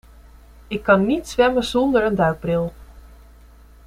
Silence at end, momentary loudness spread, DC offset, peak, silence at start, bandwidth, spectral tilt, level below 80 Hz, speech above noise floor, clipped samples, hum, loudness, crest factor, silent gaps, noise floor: 0.85 s; 9 LU; under 0.1%; -2 dBFS; 0.7 s; 15.5 kHz; -6 dB/octave; -42 dBFS; 28 dB; under 0.1%; none; -19 LUFS; 18 dB; none; -46 dBFS